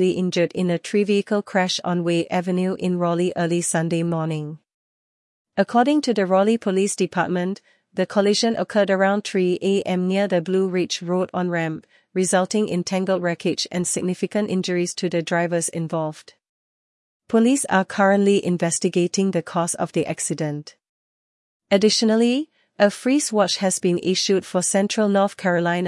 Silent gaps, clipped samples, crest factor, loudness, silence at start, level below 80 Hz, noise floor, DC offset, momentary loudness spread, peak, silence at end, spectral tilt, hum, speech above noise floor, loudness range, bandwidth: 4.74-5.45 s, 16.49-17.20 s, 20.89-21.60 s; under 0.1%; 18 dB; -21 LUFS; 0 s; -70 dBFS; under -90 dBFS; under 0.1%; 6 LU; -4 dBFS; 0 s; -4.5 dB/octave; none; over 69 dB; 3 LU; 12 kHz